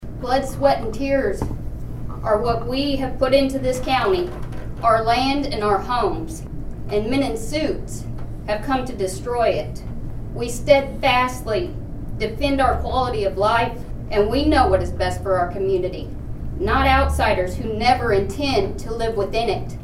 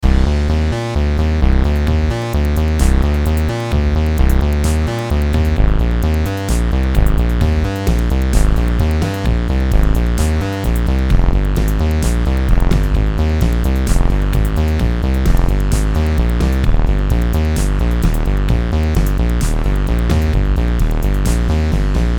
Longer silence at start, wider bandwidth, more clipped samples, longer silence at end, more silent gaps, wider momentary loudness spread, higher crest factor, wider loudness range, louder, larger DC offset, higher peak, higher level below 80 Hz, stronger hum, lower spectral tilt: about the same, 0 s vs 0 s; second, 16 kHz vs 18 kHz; neither; about the same, 0 s vs 0 s; neither; first, 15 LU vs 2 LU; first, 20 dB vs 12 dB; first, 4 LU vs 1 LU; second, -21 LUFS vs -16 LUFS; neither; about the same, 0 dBFS vs -2 dBFS; second, -30 dBFS vs -14 dBFS; neither; about the same, -5.5 dB/octave vs -6.5 dB/octave